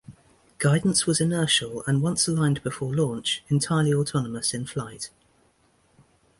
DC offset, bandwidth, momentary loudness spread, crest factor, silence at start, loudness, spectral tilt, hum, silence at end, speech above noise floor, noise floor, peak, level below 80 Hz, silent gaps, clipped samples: under 0.1%; 11.5 kHz; 10 LU; 18 dB; 0.1 s; -24 LUFS; -4.5 dB/octave; none; 1.3 s; 40 dB; -64 dBFS; -8 dBFS; -58 dBFS; none; under 0.1%